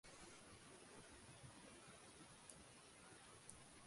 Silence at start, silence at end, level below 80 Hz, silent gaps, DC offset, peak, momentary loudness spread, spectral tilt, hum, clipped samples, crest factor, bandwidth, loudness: 0.05 s; 0 s; -78 dBFS; none; under 0.1%; -36 dBFS; 2 LU; -3 dB/octave; none; under 0.1%; 28 dB; 11.5 kHz; -62 LUFS